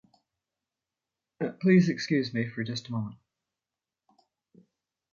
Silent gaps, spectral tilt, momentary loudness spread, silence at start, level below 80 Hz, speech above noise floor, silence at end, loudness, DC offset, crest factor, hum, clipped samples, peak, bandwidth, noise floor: none; -7 dB/octave; 13 LU; 1.4 s; -72 dBFS; over 63 dB; 2 s; -28 LUFS; under 0.1%; 22 dB; none; under 0.1%; -10 dBFS; 7.2 kHz; under -90 dBFS